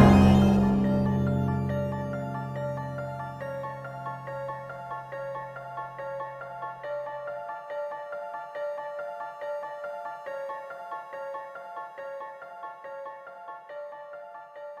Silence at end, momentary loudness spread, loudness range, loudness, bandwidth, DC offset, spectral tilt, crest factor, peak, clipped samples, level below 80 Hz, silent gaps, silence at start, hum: 0 s; 16 LU; 11 LU; -30 LUFS; 12.5 kHz; under 0.1%; -8.5 dB/octave; 24 dB; -4 dBFS; under 0.1%; -46 dBFS; none; 0 s; none